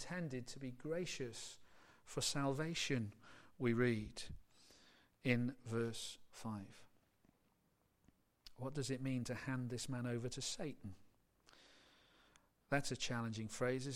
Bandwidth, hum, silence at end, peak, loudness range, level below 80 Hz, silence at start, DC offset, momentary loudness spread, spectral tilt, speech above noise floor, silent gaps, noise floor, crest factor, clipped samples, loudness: 16 kHz; none; 0 s; -20 dBFS; 7 LU; -66 dBFS; 0 s; under 0.1%; 14 LU; -4.5 dB/octave; 37 dB; none; -79 dBFS; 24 dB; under 0.1%; -43 LUFS